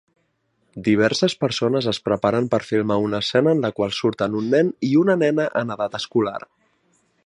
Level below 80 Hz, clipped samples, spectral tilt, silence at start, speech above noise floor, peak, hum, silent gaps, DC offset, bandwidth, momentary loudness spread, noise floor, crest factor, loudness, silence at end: -58 dBFS; under 0.1%; -6 dB/octave; 0.75 s; 48 dB; -4 dBFS; none; none; under 0.1%; 11 kHz; 6 LU; -68 dBFS; 18 dB; -20 LUFS; 0.85 s